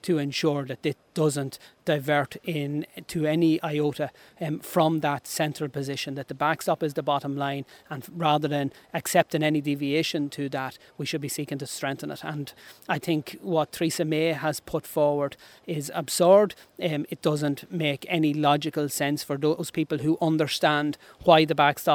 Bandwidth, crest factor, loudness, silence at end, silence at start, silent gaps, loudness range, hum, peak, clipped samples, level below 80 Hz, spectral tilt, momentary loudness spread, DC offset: over 20 kHz; 24 dB; -26 LUFS; 0 s; 0.05 s; none; 5 LU; none; -2 dBFS; under 0.1%; -66 dBFS; -5 dB/octave; 11 LU; under 0.1%